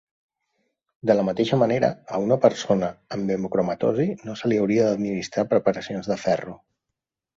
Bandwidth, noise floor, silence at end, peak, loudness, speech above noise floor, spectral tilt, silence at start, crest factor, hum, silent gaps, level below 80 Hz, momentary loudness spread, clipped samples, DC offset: 7.8 kHz; -84 dBFS; 0.85 s; -4 dBFS; -23 LUFS; 62 dB; -6.5 dB/octave; 1.05 s; 20 dB; none; none; -60 dBFS; 8 LU; under 0.1%; under 0.1%